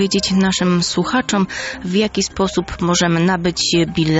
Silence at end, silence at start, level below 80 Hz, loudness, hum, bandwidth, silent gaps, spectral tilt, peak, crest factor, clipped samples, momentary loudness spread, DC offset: 0 s; 0 s; -40 dBFS; -17 LUFS; none; 8.2 kHz; none; -4.5 dB/octave; -4 dBFS; 12 dB; under 0.1%; 4 LU; under 0.1%